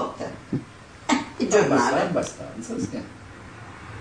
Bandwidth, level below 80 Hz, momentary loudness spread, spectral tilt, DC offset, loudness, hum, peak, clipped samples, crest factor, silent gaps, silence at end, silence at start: 10 kHz; -54 dBFS; 21 LU; -4.5 dB/octave; under 0.1%; -25 LUFS; none; -6 dBFS; under 0.1%; 20 dB; none; 0 s; 0 s